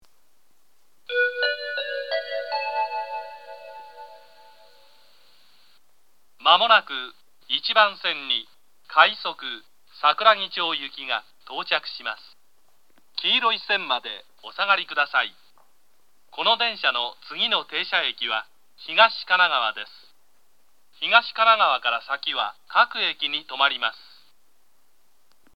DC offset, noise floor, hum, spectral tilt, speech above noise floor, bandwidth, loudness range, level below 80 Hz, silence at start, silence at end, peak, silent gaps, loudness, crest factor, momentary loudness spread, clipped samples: 0.2%; -68 dBFS; none; -2 dB/octave; 45 dB; 16 kHz; 6 LU; -80 dBFS; 1.1 s; 1.6 s; -2 dBFS; none; -22 LUFS; 24 dB; 17 LU; under 0.1%